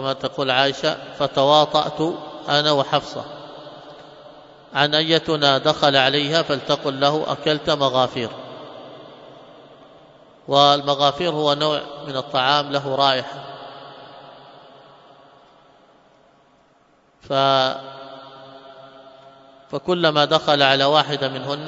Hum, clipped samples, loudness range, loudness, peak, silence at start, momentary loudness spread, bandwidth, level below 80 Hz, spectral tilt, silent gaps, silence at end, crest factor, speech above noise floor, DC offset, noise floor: none; under 0.1%; 7 LU; -19 LUFS; 0 dBFS; 0 s; 22 LU; 7.8 kHz; -62 dBFS; -4.5 dB/octave; none; 0 s; 22 dB; 38 dB; under 0.1%; -57 dBFS